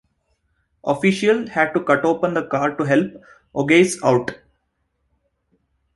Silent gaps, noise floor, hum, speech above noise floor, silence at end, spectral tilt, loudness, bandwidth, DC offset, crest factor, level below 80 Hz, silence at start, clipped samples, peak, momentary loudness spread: none; -71 dBFS; none; 52 dB; 1.6 s; -5.5 dB/octave; -19 LUFS; 11.5 kHz; under 0.1%; 18 dB; -60 dBFS; 0.85 s; under 0.1%; -2 dBFS; 12 LU